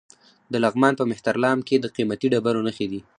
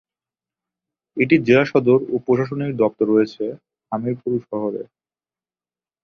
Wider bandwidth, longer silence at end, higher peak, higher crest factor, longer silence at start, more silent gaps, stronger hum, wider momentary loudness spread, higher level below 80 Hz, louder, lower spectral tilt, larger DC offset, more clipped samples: first, 10.5 kHz vs 6.6 kHz; second, 0.2 s vs 1.2 s; about the same, -2 dBFS vs -2 dBFS; about the same, 20 dB vs 20 dB; second, 0.5 s vs 1.15 s; neither; neither; second, 7 LU vs 14 LU; about the same, -64 dBFS vs -62 dBFS; second, -22 LUFS vs -19 LUFS; second, -6 dB/octave vs -8 dB/octave; neither; neither